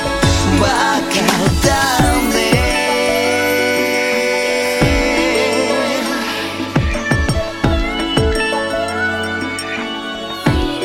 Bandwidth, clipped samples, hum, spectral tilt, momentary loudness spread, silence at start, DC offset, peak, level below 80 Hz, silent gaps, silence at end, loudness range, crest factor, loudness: 16.5 kHz; under 0.1%; none; -4 dB/octave; 6 LU; 0 s; under 0.1%; 0 dBFS; -26 dBFS; none; 0 s; 4 LU; 16 dB; -15 LUFS